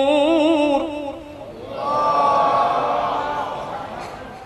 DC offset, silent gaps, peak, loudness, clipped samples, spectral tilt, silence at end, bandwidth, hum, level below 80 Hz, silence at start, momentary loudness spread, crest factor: under 0.1%; none; -6 dBFS; -19 LUFS; under 0.1%; -5.5 dB/octave; 0 s; 12 kHz; none; -50 dBFS; 0 s; 16 LU; 14 dB